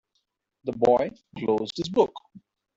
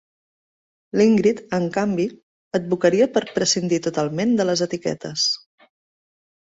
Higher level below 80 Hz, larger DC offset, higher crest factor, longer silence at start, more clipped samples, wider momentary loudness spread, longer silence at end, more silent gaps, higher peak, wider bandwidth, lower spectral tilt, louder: about the same, -62 dBFS vs -62 dBFS; neither; about the same, 20 dB vs 18 dB; second, 0.65 s vs 0.95 s; neither; first, 12 LU vs 9 LU; second, 0.4 s vs 1.1 s; second, none vs 2.23-2.51 s; second, -8 dBFS vs -4 dBFS; about the same, 7.8 kHz vs 8 kHz; first, -6 dB/octave vs -4.5 dB/octave; second, -25 LUFS vs -21 LUFS